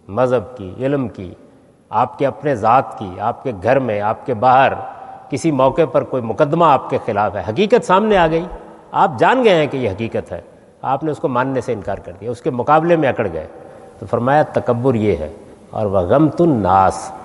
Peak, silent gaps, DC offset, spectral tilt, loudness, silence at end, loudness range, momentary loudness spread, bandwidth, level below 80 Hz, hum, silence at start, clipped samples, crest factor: 0 dBFS; none; under 0.1%; -7 dB/octave; -16 LUFS; 0 s; 4 LU; 14 LU; 11.5 kHz; -48 dBFS; none; 0.1 s; under 0.1%; 16 dB